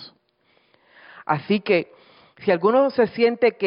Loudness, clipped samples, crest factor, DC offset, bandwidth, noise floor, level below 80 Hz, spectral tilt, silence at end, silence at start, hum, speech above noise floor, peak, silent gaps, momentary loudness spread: -21 LUFS; under 0.1%; 16 dB; under 0.1%; 5.4 kHz; -64 dBFS; -68 dBFS; -10.5 dB/octave; 0 s; 0 s; none; 44 dB; -6 dBFS; none; 10 LU